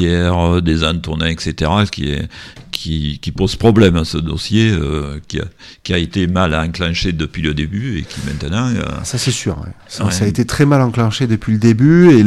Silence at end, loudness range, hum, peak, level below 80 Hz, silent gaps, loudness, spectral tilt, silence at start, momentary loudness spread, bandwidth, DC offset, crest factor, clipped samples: 0 s; 3 LU; none; 0 dBFS; -30 dBFS; none; -16 LUFS; -6 dB/octave; 0 s; 12 LU; 13.5 kHz; under 0.1%; 14 dB; under 0.1%